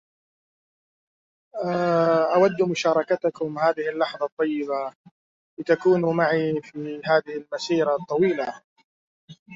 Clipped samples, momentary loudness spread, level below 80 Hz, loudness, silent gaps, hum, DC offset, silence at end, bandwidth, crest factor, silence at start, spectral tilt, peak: under 0.1%; 11 LU; -70 dBFS; -23 LUFS; 4.32-4.37 s, 4.96-5.04 s, 5.11-5.57 s, 8.64-8.76 s, 8.84-9.28 s, 9.39-9.46 s; none; under 0.1%; 0 s; 7.6 kHz; 18 dB; 1.55 s; -6 dB/octave; -6 dBFS